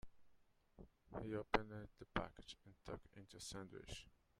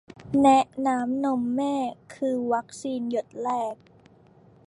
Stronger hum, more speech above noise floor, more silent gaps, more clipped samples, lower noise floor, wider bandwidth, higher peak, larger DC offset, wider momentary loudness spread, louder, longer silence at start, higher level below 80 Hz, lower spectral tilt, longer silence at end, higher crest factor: neither; second, 25 dB vs 30 dB; neither; neither; first, -74 dBFS vs -55 dBFS; first, 13.5 kHz vs 11.5 kHz; second, -18 dBFS vs -8 dBFS; neither; first, 18 LU vs 12 LU; second, -49 LUFS vs -25 LUFS; second, 0.05 s vs 0.2 s; about the same, -64 dBFS vs -64 dBFS; about the same, -4.5 dB/octave vs -5.5 dB/octave; second, 0.25 s vs 0.95 s; first, 32 dB vs 18 dB